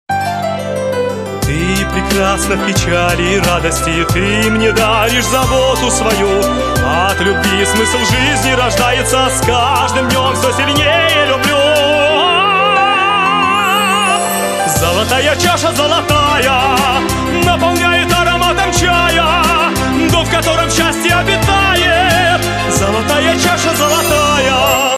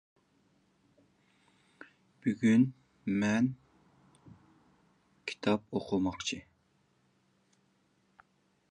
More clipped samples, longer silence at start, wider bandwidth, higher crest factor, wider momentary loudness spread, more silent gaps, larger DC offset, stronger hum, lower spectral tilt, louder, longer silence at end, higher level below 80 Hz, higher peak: neither; second, 0.1 s vs 2.25 s; first, 14 kHz vs 9.6 kHz; second, 12 dB vs 22 dB; second, 4 LU vs 16 LU; neither; neither; neither; second, -3.5 dB/octave vs -6 dB/octave; first, -11 LUFS vs -32 LUFS; second, 0 s vs 2.3 s; first, -28 dBFS vs -66 dBFS; first, 0 dBFS vs -14 dBFS